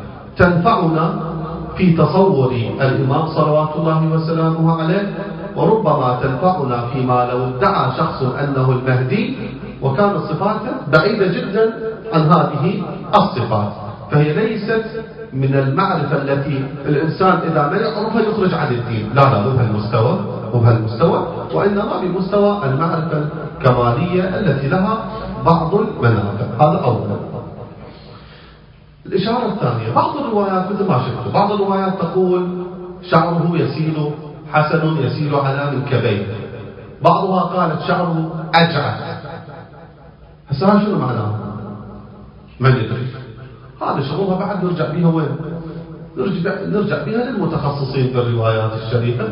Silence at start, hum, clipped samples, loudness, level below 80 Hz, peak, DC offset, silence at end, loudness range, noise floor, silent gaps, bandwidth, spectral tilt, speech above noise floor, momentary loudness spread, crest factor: 0 s; none; under 0.1%; -17 LUFS; -42 dBFS; 0 dBFS; under 0.1%; 0 s; 4 LU; -43 dBFS; none; 5.4 kHz; -10 dB/octave; 27 dB; 12 LU; 16 dB